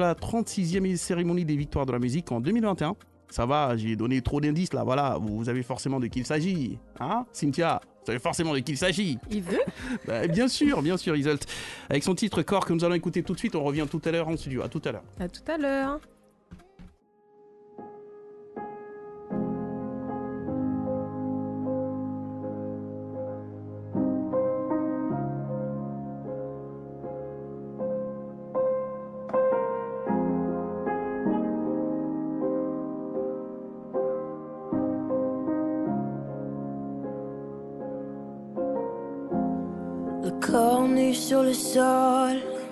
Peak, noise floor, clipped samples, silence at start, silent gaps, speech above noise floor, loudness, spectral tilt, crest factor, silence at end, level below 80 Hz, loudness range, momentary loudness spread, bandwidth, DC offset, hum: -10 dBFS; -60 dBFS; under 0.1%; 0 s; none; 33 dB; -29 LUFS; -6 dB/octave; 20 dB; 0 s; -52 dBFS; 8 LU; 13 LU; 12.5 kHz; under 0.1%; none